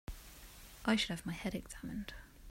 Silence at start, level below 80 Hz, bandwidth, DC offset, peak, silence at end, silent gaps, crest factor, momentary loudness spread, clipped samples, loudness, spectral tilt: 0.1 s; -54 dBFS; 16 kHz; under 0.1%; -18 dBFS; 0 s; none; 22 dB; 20 LU; under 0.1%; -39 LUFS; -4.5 dB/octave